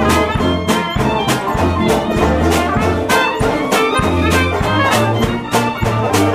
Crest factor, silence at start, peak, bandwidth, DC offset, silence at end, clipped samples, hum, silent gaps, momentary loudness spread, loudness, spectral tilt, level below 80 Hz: 14 dB; 0 s; -2 dBFS; 16 kHz; under 0.1%; 0 s; under 0.1%; none; none; 3 LU; -15 LUFS; -5 dB/octave; -28 dBFS